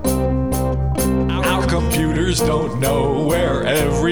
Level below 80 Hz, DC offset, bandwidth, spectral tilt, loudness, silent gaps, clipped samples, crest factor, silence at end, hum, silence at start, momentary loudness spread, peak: -26 dBFS; 1%; over 20 kHz; -5.5 dB/octave; -18 LUFS; none; under 0.1%; 14 dB; 0 s; none; 0 s; 2 LU; -4 dBFS